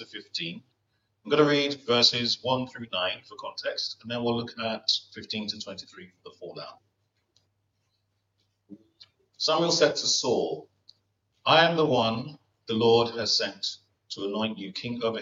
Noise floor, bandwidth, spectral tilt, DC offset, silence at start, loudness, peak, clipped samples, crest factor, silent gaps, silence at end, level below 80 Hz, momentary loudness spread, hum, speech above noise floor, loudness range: -76 dBFS; 7.8 kHz; -3.5 dB/octave; under 0.1%; 0 s; -26 LUFS; -4 dBFS; under 0.1%; 24 dB; none; 0 s; -72 dBFS; 20 LU; none; 49 dB; 9 LU